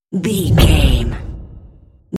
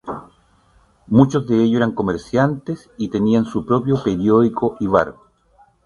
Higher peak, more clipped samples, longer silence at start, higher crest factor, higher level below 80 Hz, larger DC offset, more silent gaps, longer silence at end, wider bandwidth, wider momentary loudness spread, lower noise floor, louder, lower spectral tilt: about the same, 0 dBFS vs 0 dBFS; neither; about the same, 0.1 s vs 0.05 s; about the same, 16 dB vs 18 dB; first, -20 dBFS vs -48 dBFS; neither; neither; second, 0 s vs 0.75 s; first, 16 kHz vs 10.5 kHz; first, 19 LU vs 11 LU; second, -43 dBFS vs -55 dBFS; first, -14 LUFS vs -18 LUFS; second, -6 dB/octave vs -8 dB/octave